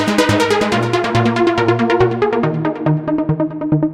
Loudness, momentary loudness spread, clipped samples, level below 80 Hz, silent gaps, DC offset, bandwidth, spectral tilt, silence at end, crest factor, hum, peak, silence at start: -15 LUFS; 4 LU; under 0.1%; -44 dBFS; none; under 0.1%; 15 kHz; -6 dB/octave; 0 s; 14 dB; none; -2 dBFS; 0 s